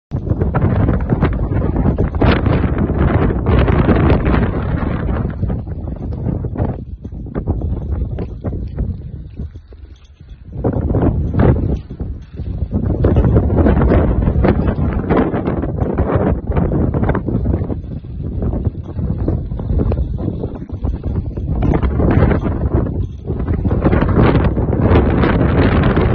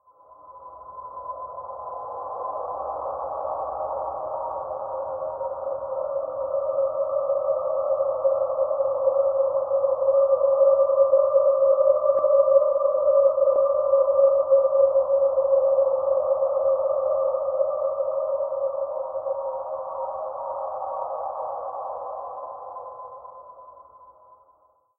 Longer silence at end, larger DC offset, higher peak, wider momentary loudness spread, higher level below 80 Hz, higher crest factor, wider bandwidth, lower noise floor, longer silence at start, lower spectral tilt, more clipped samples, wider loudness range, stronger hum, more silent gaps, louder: second, 0 s vs 1.15 s; neither; first, 0 dBFS vs -6 dBFS; second, 12 LU vs 16 LU; first, -20 dBFS vs -64 dBFS; about the same, 16 dB vs 16 dB; first, 5.2 kHz vs 1.6 kHz; second, -37 dBFS vs -61 dBFS; second, 0.1 s vs 0.45 s; about the same, -11 dB/octave vs -11 dB/octave; neither; second, 8 LU vs 13 LU; neither; neither; first, -17 LUFS vs -23 LUFS